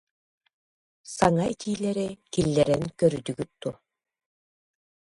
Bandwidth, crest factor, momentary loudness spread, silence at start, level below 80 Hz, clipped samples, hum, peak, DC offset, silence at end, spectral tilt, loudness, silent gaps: 11.5 kHz; 24 dB; 12 LU; 1.05 s; -54 dBFS; under 0.1%; none; -6 dBFS; under 0.1%; 1.4 s; -6 dB/octave; -26 LUFS; none